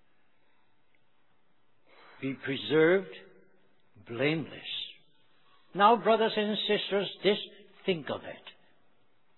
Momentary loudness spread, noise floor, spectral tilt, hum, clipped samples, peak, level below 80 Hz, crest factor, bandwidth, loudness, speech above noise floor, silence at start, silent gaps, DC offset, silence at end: 19 LU; -73 dBFS; -8 dB/octave; none; under 0.1%; -10 dBFS; -78 dBFS; 22 dB; 4.3 kHz; -29 LUFS; 45 dB; 2.2 s; none; under 0.1%; 0.9 s